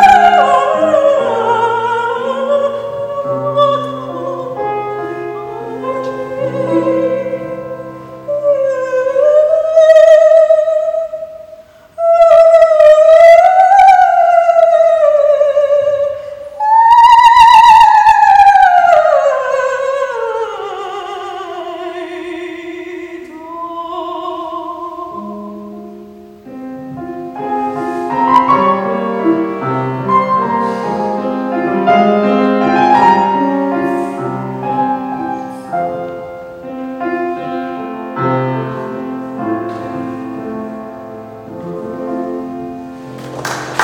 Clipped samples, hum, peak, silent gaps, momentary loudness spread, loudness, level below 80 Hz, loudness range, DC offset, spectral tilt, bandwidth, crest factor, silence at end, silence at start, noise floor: 1%; none; 0 dBFS; none; 20 LU; -11 LUFS; -50 dBFS; 17 LU; under 0.1%; -5.5 dB/octave; 12 kHz; 12 dB; 0 s; 0 s; -37 dBFS